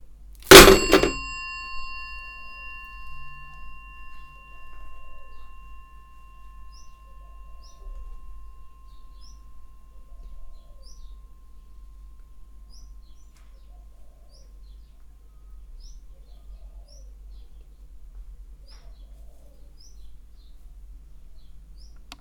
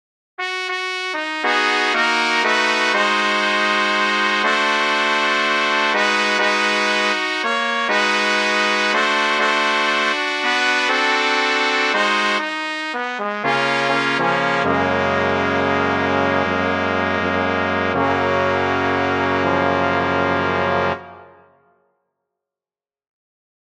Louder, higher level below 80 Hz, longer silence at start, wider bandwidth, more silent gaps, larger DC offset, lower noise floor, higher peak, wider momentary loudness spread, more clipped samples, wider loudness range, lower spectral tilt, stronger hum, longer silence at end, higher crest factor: first, -13 LUFS vs -17 LUFS; first, -38 dBFS vs -60 dBFS; about the same, 0.5 s vs 0.4 s; first, 19 kHz vs 12.5 kHz; neither; second, under 0.1% vs 0.1%; second, -47 dBFS vs under -90 dBFS; about the same, 0 dBFS vs 0 dBFS; first, 35 LU vs 5 LU; neither; first, 23 LU vs 3 LU; about the same, -2.5 dB/octave vs -3.5 dB/octave; neither; second, 2.05 s vs 2.5 s; first, 26 dB vs 18 dB